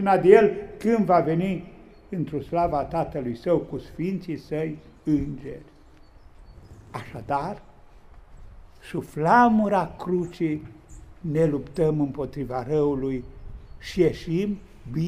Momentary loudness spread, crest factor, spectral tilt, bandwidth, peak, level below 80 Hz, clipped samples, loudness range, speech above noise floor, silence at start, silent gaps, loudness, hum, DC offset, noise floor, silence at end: 19 LU; 22 dB; -8 dB/octave; 14 kHz; -2 dBFS; -46 dBFS; under 0.1%; 9 LU; 26 dB; 0 s; none; -24 LUFS; none; under 0.1%; -50 dBFS; 0 s